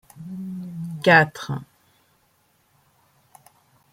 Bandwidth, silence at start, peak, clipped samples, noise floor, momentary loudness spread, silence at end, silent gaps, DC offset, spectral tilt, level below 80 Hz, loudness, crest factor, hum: 16 kHz; 0.15 s; -2 dBFS; under 0.1%; -64 dBFS; 19 LU; 2.3 s; none; under 0.1%; -6 dB/octave; -64 dBFS; -21 LUFS; 24 dB; none